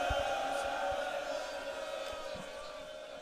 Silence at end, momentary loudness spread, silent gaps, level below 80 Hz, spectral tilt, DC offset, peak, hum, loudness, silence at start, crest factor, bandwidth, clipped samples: 0 s; 11 LU; none; -54 dBFS; -3 dB/octave; under 0.1%; -22 dBFS; none; -38 LUFS; 0 s; 16 dB; 15.5 kHz; under 0.1%